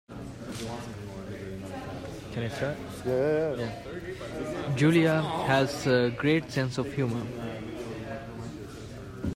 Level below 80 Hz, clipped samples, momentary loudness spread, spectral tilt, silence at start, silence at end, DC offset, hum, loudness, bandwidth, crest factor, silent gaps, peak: -54 dBFS; under 0.1%; 15 LU; -6.5 dB/octave; 0.1 s; 0 s; under 0.1%; none; -30 LUFS; 16 kHz; 18 dB; none; -12 dBFS